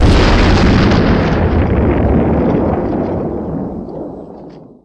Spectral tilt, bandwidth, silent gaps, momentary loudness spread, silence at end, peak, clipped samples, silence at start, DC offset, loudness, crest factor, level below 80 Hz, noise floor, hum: -7.5 dB/octave; 10 kHz; none; 16 LU; 0.2 s; 0 dBFS; under 0.1%; 0 s; under 0.1%; -13 LUFS; 12 dB; -18 dBFS; -34 dBFS; none